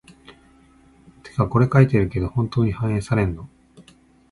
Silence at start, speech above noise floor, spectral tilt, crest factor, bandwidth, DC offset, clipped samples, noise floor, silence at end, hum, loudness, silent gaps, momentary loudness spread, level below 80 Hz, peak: 0.3 s; 34 dB; -8.5 dB/octave; 20 dB; 11.5 kHz; under 0.1%; under 0.1%; -53 dBFS; 0.5 s; none; -20 LUFS; none; 10 LU; -40 dBFS; -2 dBFS